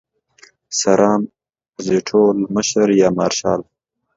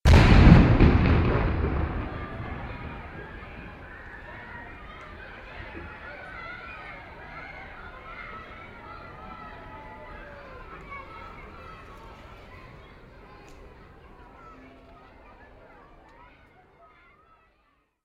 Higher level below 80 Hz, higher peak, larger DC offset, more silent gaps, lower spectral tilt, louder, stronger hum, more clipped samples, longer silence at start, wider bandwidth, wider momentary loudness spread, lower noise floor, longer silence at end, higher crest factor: second, -56 dBFS vs -30 dBFS; about the same, 0 dBFS vs -2 dBFS; neither; neither; second, -4.5 dB/octave vs -7.5 dB/octave; first, -16 LUFS vs -21 LUFS; neither; neither; first, 0.7 s vs 0.05 s; second, 7.8 kHz vs 9.8 kHz; second, 10 LU vs 27 LU; second, -51 dBFS vs -68 dBFS; second, 0.55 s vs 6.75 s; second, 18 dB vs 26 dB